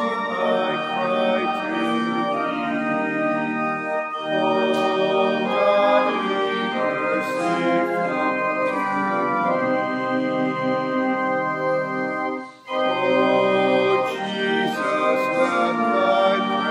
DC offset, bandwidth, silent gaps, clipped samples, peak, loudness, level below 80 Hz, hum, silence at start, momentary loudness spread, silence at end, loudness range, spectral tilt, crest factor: under 0.1%; 13 kHz; none; under 0.1%; -6 dBFS; -21 LUFS; -76 dBFS; none; 0 s; 5 LU; 0 s; 3 LU; -5.5 dB/octave; 16 dB